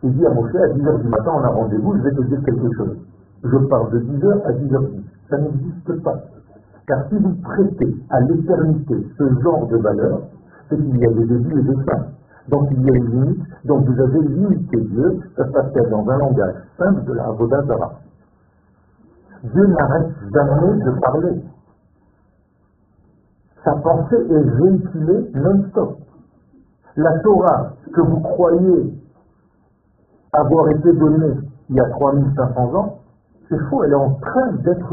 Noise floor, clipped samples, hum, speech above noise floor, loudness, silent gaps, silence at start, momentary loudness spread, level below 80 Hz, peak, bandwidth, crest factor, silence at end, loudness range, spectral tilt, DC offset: -58 dBFS; under 0.1%; none; 42 dB; -17 LUFS; none; 0.05 s; 9 LU; -42 dBFS; 0 dBFS; 2.3 kHz; 18 dB; 0 s; 4 LU; -7.5 dB/octave; under 0.1%